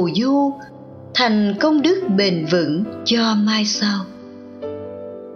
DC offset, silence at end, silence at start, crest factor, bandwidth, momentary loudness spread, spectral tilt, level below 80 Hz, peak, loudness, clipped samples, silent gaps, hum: under 0.1%; 0 s; 0 s; 16 dB; 7 kHz; 18 LU; -5 dB/octave; -64 dBFS; -4 dBFS; -18 LUFS; under 0.1%; none; none